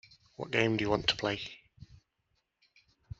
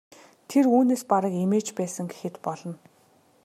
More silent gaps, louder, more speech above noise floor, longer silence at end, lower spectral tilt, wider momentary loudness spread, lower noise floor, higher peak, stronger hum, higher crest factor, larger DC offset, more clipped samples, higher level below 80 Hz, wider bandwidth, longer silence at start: neither; second, -31 LUFS vs -25 LUFS; first, 48 dB vs 37 dB; first, 1.35 s vs 0.7 s; second, -3 dB/octave vs -6.5 dB/octave; about the same, 16 LU vs 15 LU; first, -79 dBFS vs -61 dBFS; second, -12 dBFS vs -8 dBFS; neither; first, 24 dB vs 18 dB; neither; neither; first, -60 dBFS vs -76 dBFS; second, 8 kHz vs 14 kHz; about the same, 0.4 s vs 0.5 s